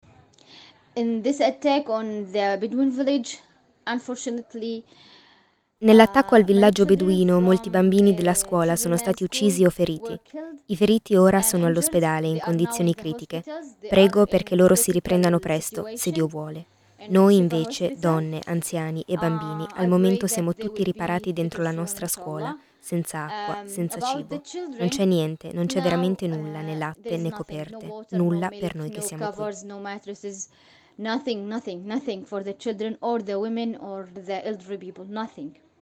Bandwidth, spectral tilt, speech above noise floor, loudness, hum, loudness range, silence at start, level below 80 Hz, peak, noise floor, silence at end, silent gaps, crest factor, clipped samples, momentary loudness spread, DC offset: 18.5 kHz; -5.5 dB/octave; 39 dB; -23 LUFS; none; 11 LU; 0.95 s; -56 dBFS; 0 dBFS; -61 dBFS; 0.3 s; none; 22 dB; under 0.1%; 18 LU; under 0.1%